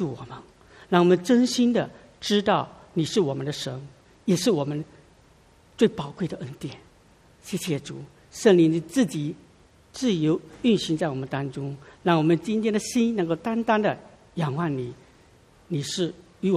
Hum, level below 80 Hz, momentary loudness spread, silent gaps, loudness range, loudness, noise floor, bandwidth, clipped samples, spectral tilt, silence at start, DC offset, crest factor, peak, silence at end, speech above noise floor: none; -60 dBFS; 17 LU; none; 5 LU; -25 LUFS; -56 dBFS; 14.5 kHz; under 0.1%; -5.5 dB/octave; 0 s; under 0.1%; 20 dB; -4 dBFS; 0 s; 32 dB